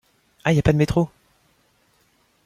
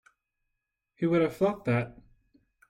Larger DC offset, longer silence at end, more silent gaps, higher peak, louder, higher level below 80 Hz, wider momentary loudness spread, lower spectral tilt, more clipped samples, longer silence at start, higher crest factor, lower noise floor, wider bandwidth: neither; first, 1.4 s vs 0.8 s; neither; first, -2 dBFS vs -14 dBFS; first, -21 LUFS vs -28 LUFS; first, -42 dBFS vs -64 dBFS; about the same, 9 LU vs 7 LU; about the same, -7.5 dB/octave vs -8.5 dB/octave; neither; second, 0.45 s vs 1 s; about the same, 20 dB vs 18 dB; second, -63 dBFS vs -83 dBFS; second, 14 kHz vs 16 kHz